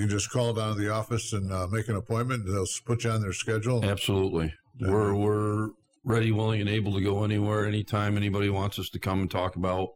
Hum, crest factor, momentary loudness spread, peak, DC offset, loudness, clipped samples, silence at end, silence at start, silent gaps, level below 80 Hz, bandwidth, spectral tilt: none; 14 dB; 5 LU; -14 dBFS; under 0.1%; -28 LUFS; under 0.1%; 0.05 s; 0 s; none; -52 dBFS; 16 kHz; -5.5 dB/octave